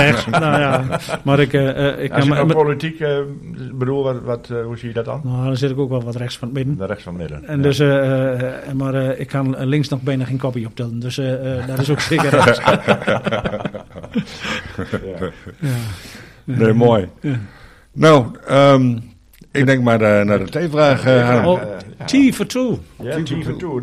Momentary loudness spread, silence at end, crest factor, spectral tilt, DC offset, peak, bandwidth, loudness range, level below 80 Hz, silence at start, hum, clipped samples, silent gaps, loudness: 13 LU; 0 s; 16 dB; -6.5 dB/octave; under 0.1%; 0 dBFS; 14.5 kHz; 7 LU; -46 dBFS; 0 s; none; under 0.1%; none; -17 LUFS